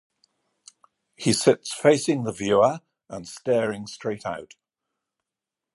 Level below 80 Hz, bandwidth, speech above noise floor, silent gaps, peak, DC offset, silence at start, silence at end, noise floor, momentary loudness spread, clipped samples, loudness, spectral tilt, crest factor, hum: -64 dBFS; 11.5 kHz; 65 dB; none; -2 dBFS; under 0.1%; 1.2 s; 1.3 s; -88 dBFS; 17 LU; under 0.1%; -23 LUFS; -4.5 dB/octave; 24 dB; none